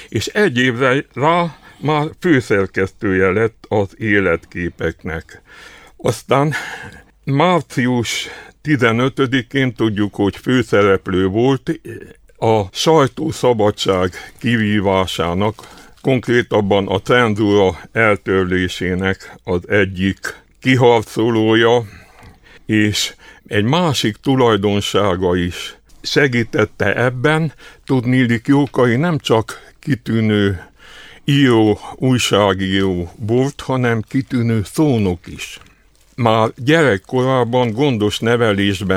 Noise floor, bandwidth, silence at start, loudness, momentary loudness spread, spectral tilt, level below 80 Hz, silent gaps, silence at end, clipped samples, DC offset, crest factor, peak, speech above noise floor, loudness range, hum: -51 dBFS; 16 kHz; 0 s; -16 LUFS; 10 LU; -5.5 dB/octave; -46 dBFS; none; 0 s; under 0.1%; under 0.1%; 16 dB; 0 dBFS; 35 dB; 3 LU; none